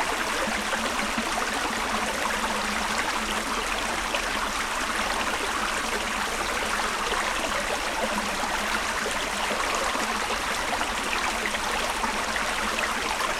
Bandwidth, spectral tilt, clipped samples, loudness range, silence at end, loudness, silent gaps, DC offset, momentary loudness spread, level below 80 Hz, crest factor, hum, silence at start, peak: 18.5 kHz; -1.5 dB/octave; under 0.1%; 0 LU; 0 s; -26 LUFS; none; under 0.1%; 1 LU; -44 dBFS; 16 dB; none; 0 s; -10 dBFS